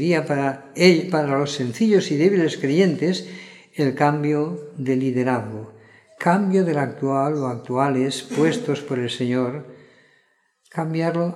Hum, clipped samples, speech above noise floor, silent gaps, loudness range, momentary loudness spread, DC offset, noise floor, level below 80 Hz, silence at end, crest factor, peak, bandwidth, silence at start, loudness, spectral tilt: none; under 0.1%; 43 dB; none; 5 LU; 10 LU; under 0.1%; -64 dBFS; -70 dBFS; 0 s; 20 dB; -2 dBFS; 13 kHz; 0 s; -21 LUFS; -6 dB/octave